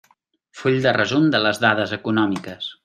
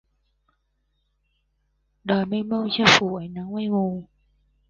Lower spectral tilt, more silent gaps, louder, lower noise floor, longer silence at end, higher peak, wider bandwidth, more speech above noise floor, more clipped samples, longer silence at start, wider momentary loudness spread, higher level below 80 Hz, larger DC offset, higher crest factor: first, -5.5 dB/octave vs -4 dB/octave; neither; first, -19 LUFS vs -22 LUFS; second, -62 dBFS vs -71 dBFS; second, 0.1 s vs 0.65 s; about the same, -2 dBFS vs 0 dBFS; first, 14 kHz vs 9.8 kHz; second, 42 dB vs 49 dB; neither; second, 0.55 s vs 2.05 s; second, 8 LU vs 16 LU; about the same, -62 dBFS vs -58 dBFS; neither; second, 18 dB vs 26 dB